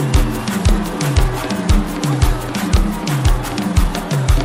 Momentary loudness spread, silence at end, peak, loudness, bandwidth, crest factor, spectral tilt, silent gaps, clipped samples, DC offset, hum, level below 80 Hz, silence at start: 3 LU; 0 s; -2 dBFS; -18 LUFS; 16.5 kHz; 14 dB; -5.5 dB/octave; none; under 0.1%; under 0.1%; none; -18 dBFS; 0 s